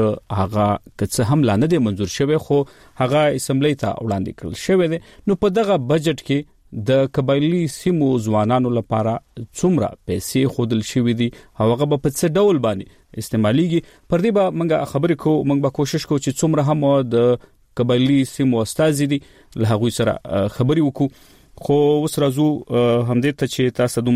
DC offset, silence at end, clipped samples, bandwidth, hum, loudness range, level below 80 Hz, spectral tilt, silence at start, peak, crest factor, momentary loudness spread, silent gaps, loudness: under 0.1%; 0 s; under 0.1%; 15.5 kHz; none; 2 LU; -48 dBFS; -6.5 dB/octave; 0 s; -6 dBFS; 12 dB; 7 LU; none; -19 LUFS